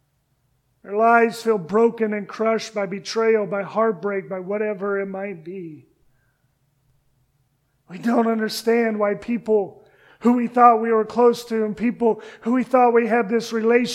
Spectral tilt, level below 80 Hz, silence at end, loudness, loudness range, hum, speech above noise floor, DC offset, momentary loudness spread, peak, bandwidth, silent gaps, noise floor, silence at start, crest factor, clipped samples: -5.5 dB/octave; -66 dBFS; 0 s; -20 LUFS; 11 LU; none; 47 dB; under 0.1%; 12 LU; 0 dBFS; 14 kHz; none; -67 dBFS; 0.85 s; 20 dB; under 0.1%